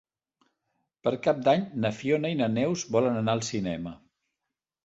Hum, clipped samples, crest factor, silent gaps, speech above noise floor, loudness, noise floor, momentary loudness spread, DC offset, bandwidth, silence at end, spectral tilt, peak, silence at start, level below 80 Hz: none; under 0.1%; 20 dB; none; 60 dB; -27 LUFS; -87 dBFS; 7 LU; under 0.1%; 8.2 kHz; 0.9 s; -5.5 dB/octave; -10 dBFS; 1.05 s; -62 dBFS